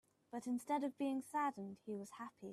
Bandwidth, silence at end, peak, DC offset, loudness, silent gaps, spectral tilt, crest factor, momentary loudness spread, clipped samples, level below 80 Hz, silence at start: 14 kHz; 0 s; -28 dBFS; under 0.1%; -43 LUFS; none; -5.5 dB/octave; 16 dB; 12 LU; under 0.1%; -88 dBFS; 0.35 s